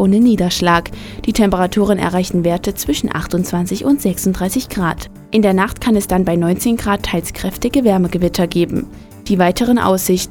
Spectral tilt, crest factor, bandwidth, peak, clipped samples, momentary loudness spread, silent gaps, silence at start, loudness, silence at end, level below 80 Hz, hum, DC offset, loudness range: -5.5 dB/octave; 16 dB; 19 kHz; 0 dBFS; under 0.1%; 7 LU; none; 0 s; -16 LUFS; 0 s; -34 dBFS; none; under 0.1%; 2 LU